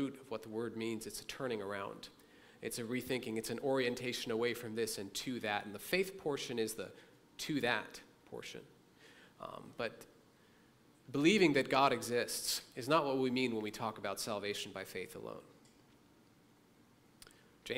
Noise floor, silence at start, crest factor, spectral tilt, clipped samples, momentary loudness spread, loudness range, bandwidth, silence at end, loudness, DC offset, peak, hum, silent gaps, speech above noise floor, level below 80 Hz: -67 dBFS; 0 s; 26 dB; -4 dB/octave; under 0.1%; 19 LU; 11 LU; 16 kHz; 0 s; -37 LUFS; under 0.1%; -14 dBFS; none; none; 29 dB; -72 dBFS